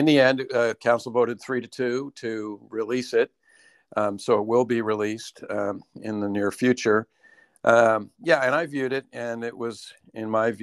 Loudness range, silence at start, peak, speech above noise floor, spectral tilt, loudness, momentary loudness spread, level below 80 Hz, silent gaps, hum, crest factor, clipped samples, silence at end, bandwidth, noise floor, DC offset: 4 LU; 0 s; -4 dBFS; 35 dB; -5.5 dB/octave; -24 LUFS; 13 LU; -72 dBFS; none; none; 20 dB; under 0.1%; 0 s; 12.5 kHz; -58 dBFS; under 0.1%